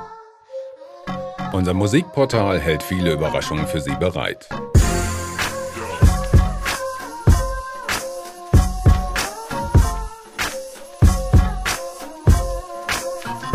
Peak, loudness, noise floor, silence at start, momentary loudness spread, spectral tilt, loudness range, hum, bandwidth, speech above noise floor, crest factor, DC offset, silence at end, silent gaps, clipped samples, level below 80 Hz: -2 dBFS; -20 LUFS; -41 dBFS; 0 s; 13 LU; -5.5 dB/octave; 1 LU; none; 16 kHz; 21 dB; 16 dB; under 0.1%; 0 s; none; under 0.1%; -24 dBFS